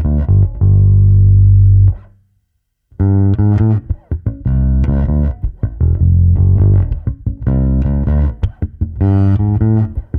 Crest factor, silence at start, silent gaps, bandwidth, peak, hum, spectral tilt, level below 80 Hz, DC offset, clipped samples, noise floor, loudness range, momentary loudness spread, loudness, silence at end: 10 dB; 0 s; none; 2.1 kHz; -2 dBFS; none; -12.5 dB/octave; -18 dBFS; under 0.1%; under 0.1%; -66 dBFS; 3 LU; 12 LU; -13 LUFS; 0 s